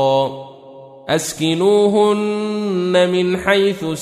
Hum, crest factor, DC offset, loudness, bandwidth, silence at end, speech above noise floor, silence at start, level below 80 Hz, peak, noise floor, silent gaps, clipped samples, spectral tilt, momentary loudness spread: none; 16 dB; under 0.1%; -16 LUFS; 15.5 kHz; 0 s; 23 dB; 0 s; -54 dBFS; -2 dBFS; -39 dBFS; none; under 0.1%; -5 dB/octave; 9 LU